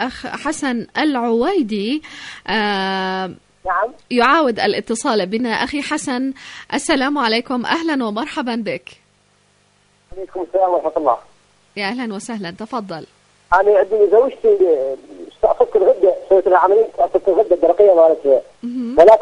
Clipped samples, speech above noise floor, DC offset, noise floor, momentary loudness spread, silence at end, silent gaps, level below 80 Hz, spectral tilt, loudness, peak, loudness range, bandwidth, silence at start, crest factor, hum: under 0.1%; 41 dB; under 0.1%; -57 dBFS; 14 LU; 0 s; none; -50 dBFS; -4 dB/octave; -17 LUFS; 0 dBFS; 8 LU; 11 kHz; 0 s; 16 dB; none